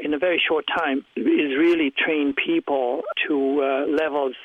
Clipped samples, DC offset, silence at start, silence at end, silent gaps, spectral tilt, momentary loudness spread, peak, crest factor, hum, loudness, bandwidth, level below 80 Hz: under 0.1%; under 0.1%; 0 s; 0 s; none; -5.5 dB/octave; 5 LU; -8 dBFS; 12 dB; none; -22 LUFS; 5.8 kHz; -64 dBFS